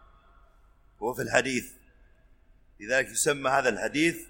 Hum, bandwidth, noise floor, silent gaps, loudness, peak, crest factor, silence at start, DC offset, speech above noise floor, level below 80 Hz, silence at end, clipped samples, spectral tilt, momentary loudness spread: none; 17 kHz; -59 dBFS; none; -27 LUFS; -6 dBFS; 24 dB; 1 s; under 0.1%; 32 dB; -58 dBFS; 0 s; under 0.1%; -3 dB/octave; 11 LU